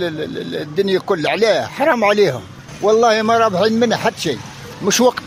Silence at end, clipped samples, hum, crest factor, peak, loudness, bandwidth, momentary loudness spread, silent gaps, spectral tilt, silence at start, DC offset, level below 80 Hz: 0 s; under 0.1%; none; 14 dB; -2 dBFS; -16 LUFS; 16 kHz; 11 LU; none; -4 dB/octave; 0 s; under 0.1%; -54 dBFS